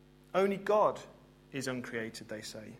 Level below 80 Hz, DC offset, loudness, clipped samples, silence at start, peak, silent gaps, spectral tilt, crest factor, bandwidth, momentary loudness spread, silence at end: -68 dBFS; under 0.1%; -34 LUFS; under 0.1%; 0.35 s; -16 dBFS; none; -5 dB/octave; 20 dB; 16 kHz; 14 LU; 0 s